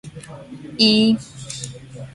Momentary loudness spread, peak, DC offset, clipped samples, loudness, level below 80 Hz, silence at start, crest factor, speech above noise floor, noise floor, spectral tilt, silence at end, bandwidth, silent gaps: 23 LU; -2 dBFS; under 0.1%; under 0.1%; -16 LUFS; -54 dBFS; 0.05 s; 20 dB; 16 dB; -35 dBFS; -4 dB/octave; 0.05 s; 11.5 kHz; none